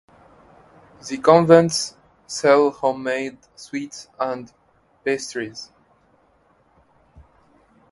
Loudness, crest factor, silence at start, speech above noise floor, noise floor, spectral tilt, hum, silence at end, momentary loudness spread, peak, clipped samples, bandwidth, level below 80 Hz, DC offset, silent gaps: -20 LUFS; 22 dB; 1.05 s; 40 dB; -59 dBFS; -5 dB/octave; none; 2.3 s; 20 LU; 0 dBFS; under 0.1%; 11.5 kHz; -60 dBFS; under 0.1%; none